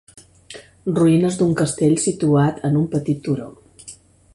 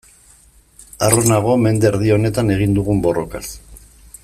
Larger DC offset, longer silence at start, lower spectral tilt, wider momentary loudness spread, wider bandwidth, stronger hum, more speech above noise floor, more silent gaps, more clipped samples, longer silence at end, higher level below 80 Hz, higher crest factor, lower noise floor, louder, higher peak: neither; second, 0.5 s vs 1 s; about the same, -6.5 dB/octave vs -5.5 dB/octave; first, 23 LU vs 14 LU; second, 11.5 kHz vs 15 kHz; neither; second, 26 dB vs 34 dB; neither; neither; about the same, 0.4 s vs 0.45 s; second, -52 dBFS vs -38 dBFS; about the same, 16 dB vs 18 dB; second, -44 dBFS vs -49 dBFS; second, -19 LUFS vs -16 LUFS; second, -4 dBFS vs 0 dBFS